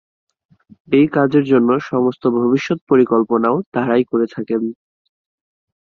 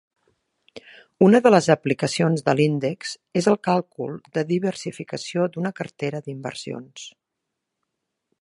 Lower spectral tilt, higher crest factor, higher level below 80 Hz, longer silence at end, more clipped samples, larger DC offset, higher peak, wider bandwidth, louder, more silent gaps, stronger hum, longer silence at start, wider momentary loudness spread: first, -8 dB/octave vs -6 dB/octave; second, 16 dB vs 22 dB; first, -60 dBFS vs -68 dBFS; second, 1.1 s vs 1.3 s; neither; neither; about the same, -2 dBFS vs -2 dBFS; second, 6.8 kHz vs 11.5 kHz; first, -16 LUFS vs -22 LUFS; first, 2.81-2.87 s, 3.66-3.72 s vs none; neither; first, 0.9 s vs 0.75 s; second, 7 LU vs 16 LU